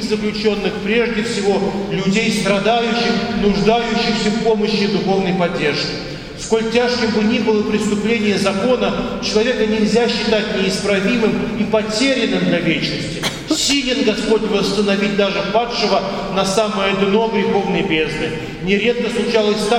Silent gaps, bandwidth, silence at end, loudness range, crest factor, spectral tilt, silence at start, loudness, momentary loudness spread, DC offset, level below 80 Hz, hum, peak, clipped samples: none; 15 kHz; 0 s; 1 LU; 16 dB; -4.5 dB/octave; 0 s; -17 LUFS; 4 LU; under 0.1%; -40 dBFS; none; 0 dBFS; under 0.1%